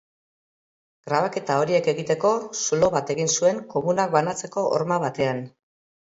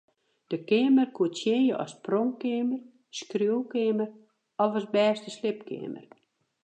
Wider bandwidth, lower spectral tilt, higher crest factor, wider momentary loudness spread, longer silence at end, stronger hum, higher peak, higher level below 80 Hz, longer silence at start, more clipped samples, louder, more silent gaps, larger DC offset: second, 8 kHz vs 9 kHz; second, -4 dB/octave vs -5.5 dB/octave; about the same, 20 dB vs 16 dB; second, 5 LU vs 14 LU; about the same, 0.55 s vs 0.65 s; neither; first, -4 dBFS vs -12 dBFS; first, -62 dBFS vs -82 dBFS; first, 1.05 s vs 0.5 s; neither; first, -23 LUFS vs -28 LUFS; neither; neither